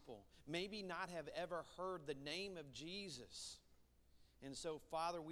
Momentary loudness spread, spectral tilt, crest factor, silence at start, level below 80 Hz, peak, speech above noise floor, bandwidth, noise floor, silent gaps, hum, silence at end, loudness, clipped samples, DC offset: 9 LU; -3.5 dB/octave; 20 dB; 0 s; -74 dBFS; -30 dBFS; 23 dB; 16 kHz; -72 dBFS; none; none; 0 s; -49 LUFS; under 0.1%; under 0.1%